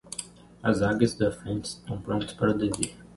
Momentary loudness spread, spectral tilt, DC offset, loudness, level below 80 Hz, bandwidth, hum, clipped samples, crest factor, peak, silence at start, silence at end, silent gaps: 12 LU; -5.5 dB/octave; under 0.1%; -28 LUFS; -50 dBFS; 11.5 kHz; none; under 0.1%; 22 dB; -8 dBFS; 0.05 s; 0.1 s; none